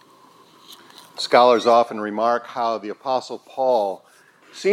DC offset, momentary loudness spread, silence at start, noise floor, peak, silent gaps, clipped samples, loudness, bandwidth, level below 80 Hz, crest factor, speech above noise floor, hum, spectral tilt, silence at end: under 0.1%; 14 LU; 0.7 s; -51 dBFS; 0 dBFS; none; under 0.1%; -20 LUFS; 14.5 kHz; -84 dBFS; 20 dB; 32 dB; none; -4 dB/octave; 0 s